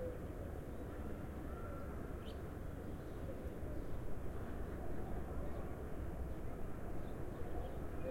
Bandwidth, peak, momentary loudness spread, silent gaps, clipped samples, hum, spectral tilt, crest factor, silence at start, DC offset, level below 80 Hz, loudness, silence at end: 16.5 kHz; -30 dBFS; 2 LU; none; under 0.1%; none; -7.5 dB/octave; 14 dB; 0 s; under 0.1%; -48 dBFS; -48 LUFS; 0 s